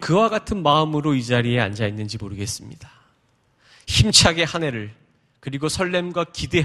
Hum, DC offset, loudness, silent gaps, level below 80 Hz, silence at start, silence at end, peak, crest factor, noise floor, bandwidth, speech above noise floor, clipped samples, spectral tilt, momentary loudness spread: none; under 0.1%; -20 LUFS; none; -40 dBFS; 0 s; 0 s; 0 dBFS; 22 dB; -63 dBFS; 14 kHz; 42 dB; under 0.1%; -4 dB/octave; 18 LU